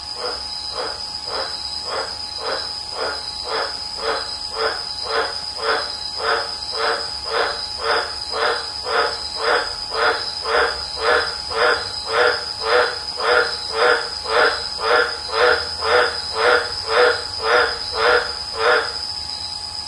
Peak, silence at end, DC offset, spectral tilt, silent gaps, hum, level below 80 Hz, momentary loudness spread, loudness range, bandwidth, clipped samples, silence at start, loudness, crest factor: -2 dBFS; 0 s; under 0.1%; -1.5 dB/octave; none; none; -48 dBFS; 8 LU; 6 LU; 11.5 kHz; under 0.1%; 0 s; -20 LUFS; 18 dB